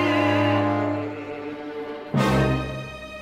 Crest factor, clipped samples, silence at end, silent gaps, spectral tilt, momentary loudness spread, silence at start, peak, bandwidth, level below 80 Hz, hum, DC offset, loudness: 16 dB; under 0.1%; 0 s; none; -7 dB/octave; 13 LU; 0 s; -8 dBFS; 15 kHz; -42 dBFS; none; under 0.1%; -24 LUFS